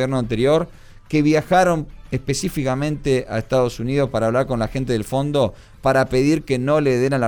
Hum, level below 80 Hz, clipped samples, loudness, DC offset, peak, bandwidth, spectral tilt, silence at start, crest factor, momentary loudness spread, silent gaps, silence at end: none; -40 dBFS; under 0.1%; -20 LUFS; under 0.1%; -6 dBFS; over 20 kHz; -6 dB/octave; 0 s; 14 dB; 7 LU; none; 0 s